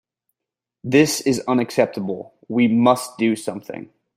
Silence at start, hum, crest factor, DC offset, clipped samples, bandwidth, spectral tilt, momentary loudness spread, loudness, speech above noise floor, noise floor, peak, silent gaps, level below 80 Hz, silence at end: 0.85 s; none; 20 dB; under 0.1%; under 0.1%; 16 kHz; -5 dB/octave; 16 LU; -19 LUFS; 67 dB; -86 dBFS; -2 dBFS; none; -62 dBFS; 0.35 s